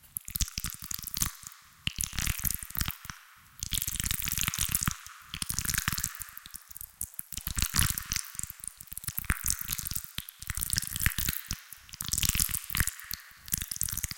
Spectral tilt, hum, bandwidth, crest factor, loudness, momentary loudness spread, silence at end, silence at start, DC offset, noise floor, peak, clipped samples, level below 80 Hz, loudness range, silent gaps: -1 dB/octave; none; 17.5 kHz; 28 dB; -32 LUFS; 13 LU; 0 s; 0.05 s; under 0.1%; -53 dBFS; -6 dBFS; under 0.1%; -42 dBFS; 3 LU; none